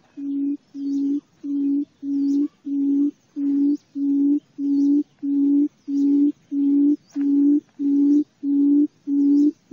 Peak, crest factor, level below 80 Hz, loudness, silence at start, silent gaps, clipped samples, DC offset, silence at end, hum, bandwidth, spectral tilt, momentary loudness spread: -10 dBFS; 10 dB; -78 dBFS; -21 LUFS; 0.15 s; none; under 0.1%; under 0.1%; 0.2 s; none; 0.9 kHz; -8 dB/octave; 8 LU